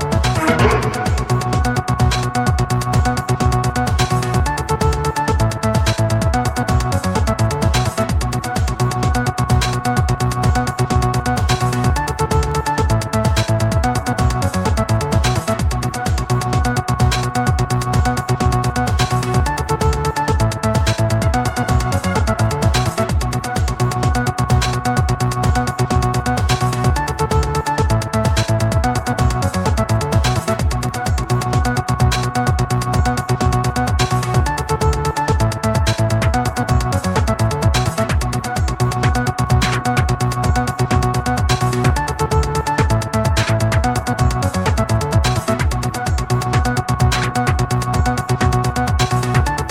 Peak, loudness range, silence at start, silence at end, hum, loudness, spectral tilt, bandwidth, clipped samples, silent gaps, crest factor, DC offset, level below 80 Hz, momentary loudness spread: 0 dBFS; 1 LU; 0 s; 0 s; none; -17 LUFS; -5.5 dB/octave; 16 kHz; under 0.1%; none; 16 dB; under 0.1%; -24 dBFS; 2 LU